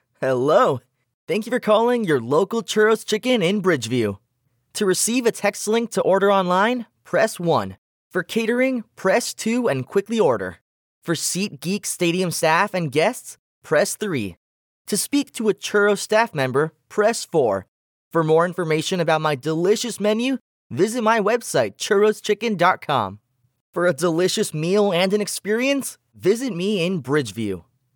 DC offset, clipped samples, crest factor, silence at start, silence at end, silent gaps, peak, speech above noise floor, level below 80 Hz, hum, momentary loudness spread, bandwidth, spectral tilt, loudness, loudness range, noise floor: under 0.1%; under 0.1%; 18 dB; 0.2 s; 0.35 s; 1.14-1.27 s, 7.78-8.11 s, 10.61-11.02 s, 13.39-13.62 s, 14.37-14.85 s, 17.68-18.11 s, 20.41-20.70 s, 23.61-23.73 s; -4 dBFS; 49 dB; -70 dBFS; none; 8 LU; 19 kHz; -4.5 dB/octave; -21 LUFS; 2 LU; -69 dBFS